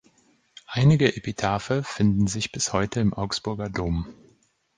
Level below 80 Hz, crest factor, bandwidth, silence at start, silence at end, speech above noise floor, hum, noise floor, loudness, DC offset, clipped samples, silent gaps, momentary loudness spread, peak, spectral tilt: -44 dBFS; 20 dB; 10 kHz; 0.7 s; 0.65 s; 39 dB; none; -63 dBFS; -24 LUFS; under 0.1%; under 0.1%; none; 9 LU; -4 dBFS; -5.5 dB/octave